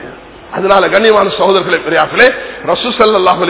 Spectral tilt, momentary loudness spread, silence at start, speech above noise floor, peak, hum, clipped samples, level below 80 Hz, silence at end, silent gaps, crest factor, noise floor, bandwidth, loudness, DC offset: -8 dB/octave; 10 LU; 0 s; 21 dB; 0 dBFS; none; 2%; -44 dBFS; 0 s; none; 10 dB; -31 dBFS; 4 kHz; -10 LUFS; under 0.1%